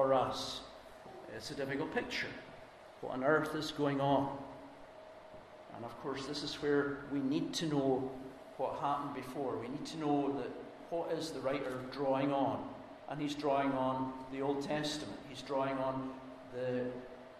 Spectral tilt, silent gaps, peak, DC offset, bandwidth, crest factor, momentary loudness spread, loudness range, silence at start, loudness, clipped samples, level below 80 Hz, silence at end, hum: -5.5 dB/octave; none; -16 dBFS; under 0.1%; 13.5 kHz; 20 dB; 17 LU; 3 LU; 0 s; -37 LUFS; under 0.1%; -66 dBFS; 0 s; none